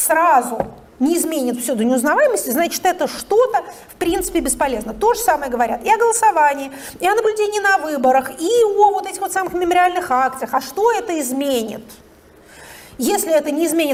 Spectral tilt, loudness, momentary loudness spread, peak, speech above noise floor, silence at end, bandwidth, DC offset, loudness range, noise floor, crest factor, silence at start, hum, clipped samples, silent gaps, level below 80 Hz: -2.5 dB/octave; -17 LUFS; 9 LU; -2 dBFS; 29 dB; 0 s; 18 kHz; under 0.1%; 4 LU; -46 dBFS; 16 dB; 0 s; none; under 0.1%; none; -46 dBFS